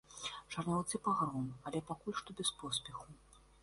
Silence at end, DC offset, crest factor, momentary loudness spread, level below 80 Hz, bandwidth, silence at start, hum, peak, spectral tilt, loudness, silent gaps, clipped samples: 0.2 s; under 0.1%; 18 dB; 9 LU; -66 dBFS; 11.5 kHz; 0.1 s; none; -22 dBFS; -4 dB/octave; -39 LUFS; none; under 0.1%